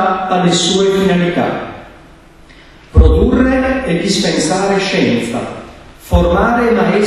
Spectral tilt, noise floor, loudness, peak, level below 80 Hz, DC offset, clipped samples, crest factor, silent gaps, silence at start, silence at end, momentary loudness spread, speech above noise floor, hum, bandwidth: -5 dB/octave; -40 dBFS; -13 LUFS; 0 dBFS; -22 dBFS; under 0.1%; 0.2%; 14 dB; none; 0 s; 0 s; 10 LU; 27 dB; none; 13 kHz